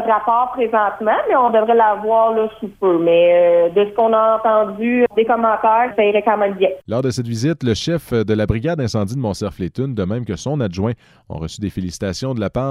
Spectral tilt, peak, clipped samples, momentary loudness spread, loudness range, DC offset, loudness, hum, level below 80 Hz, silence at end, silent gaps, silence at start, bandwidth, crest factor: -6.5 dB/octave; -4 dBFS; under 0.1%; 10 LU; 8 LU; under 0.1%; -17 LUFS; none; -42 dBFS; 0 s; none; 0 s; 14 kHz; 12 dB